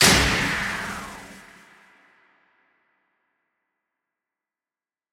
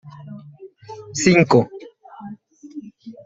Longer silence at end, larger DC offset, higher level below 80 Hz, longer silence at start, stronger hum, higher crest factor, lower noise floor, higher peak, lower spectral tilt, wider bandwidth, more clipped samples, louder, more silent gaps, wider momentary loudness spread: first, 3.75 s vs 0.15 s; neither; first, -42 dBFS vs -58 dBFS; about the same, 0 s vs 0.05 s; neither; about the same, 24 dB vs 20 dB; first, under -90 dBFS vs -43 dBFS; about the same, -4 dBFS vs -2 dBFS; second, -2.5 dB/octave vs -5.5 dB/octave; first, over 20 kHz vs 7.8 kHz; neither; second, -22 LUFS vs -17 LUFS; neither; about the same, 25 LU vs 25 LU